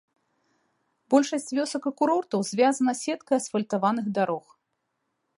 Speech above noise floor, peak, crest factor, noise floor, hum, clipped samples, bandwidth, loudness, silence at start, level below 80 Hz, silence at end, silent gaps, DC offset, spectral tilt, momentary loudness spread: 53 dB; -8 dBFS; 20 dB; -78 dBFS; none; under 0.1%; 11.5 kHz; -26 LUFS; 1.1 s; -80 dBFS; 1 s; none; under 0.1%; -4.5 dB/octave; 6 LU